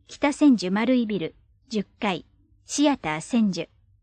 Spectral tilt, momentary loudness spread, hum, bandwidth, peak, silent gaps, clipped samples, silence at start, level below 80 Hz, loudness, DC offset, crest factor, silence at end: -5 dB/octave; 13 LU; none; 9.8 kHz; -8 dBFS; none; under 0.1%; 0.1 s; -60 dBFS; -24 LUFS; under 0.1%; 16 dB; 0.4 s